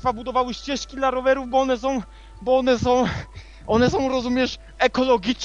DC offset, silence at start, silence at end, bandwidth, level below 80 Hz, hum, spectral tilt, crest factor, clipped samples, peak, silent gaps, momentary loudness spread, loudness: under 0.1%; 0 s; 0 s; 7.6 kHz; -42 dBFS; none; -5 dB/octave; 18 dB; under 0.1%; -4 dBFS; none; 10 LU; -22 LUFS